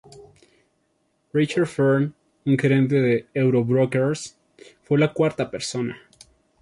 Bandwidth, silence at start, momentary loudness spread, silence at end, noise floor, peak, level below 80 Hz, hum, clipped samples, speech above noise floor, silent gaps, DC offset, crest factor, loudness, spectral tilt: 11.5 kHz; 0.15 s; 11 LU; 0.65 s; -69 dBFS; -6 dBFS; -62 dBFS; none; under 0.1%; 48 dB; none; under 0.1%; 16 dB; -22 LUFS; -6.5 dB/octave